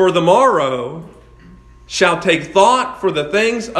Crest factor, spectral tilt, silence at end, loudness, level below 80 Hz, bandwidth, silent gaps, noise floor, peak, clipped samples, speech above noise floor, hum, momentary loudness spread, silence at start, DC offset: 16 dB; -4 dB/octave; 0 s; -14 LUFS; -48 dBFS; 12 kHz; none; -42 dBFS; 0 dBFS; under 0.1%; 27 dB; none; 12 LU; 0 s; under 0.1%